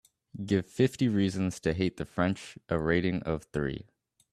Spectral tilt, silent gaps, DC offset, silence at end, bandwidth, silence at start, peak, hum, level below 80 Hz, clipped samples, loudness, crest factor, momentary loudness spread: -6.5 dB/octave; none; under 0.1%; 0.5 s; 13 kHz; 0.35 s; -12 dBFS; none; -54 dBFS; under 0.1%; -30 LUFS; 20 dB; 10 LU